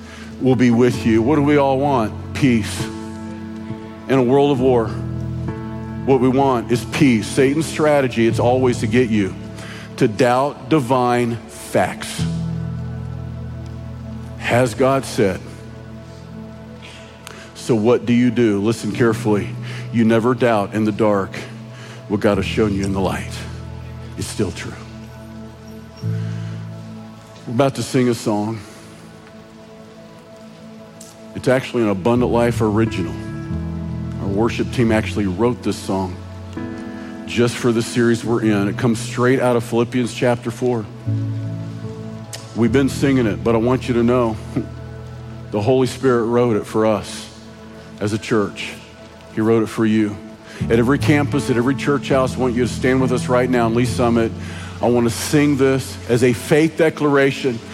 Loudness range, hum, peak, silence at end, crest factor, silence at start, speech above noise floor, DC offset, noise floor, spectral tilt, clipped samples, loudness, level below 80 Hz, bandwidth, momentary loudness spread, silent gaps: 6 LU; none; -2 dBFS; 0 s; 16 dB; 0 s; 23 dB; under 0.1%; -40 dBFS; -6.5 dB/octave; under 0.1%; -18 LUFS; -42 dBFS; 15 kHz; 18 LU; none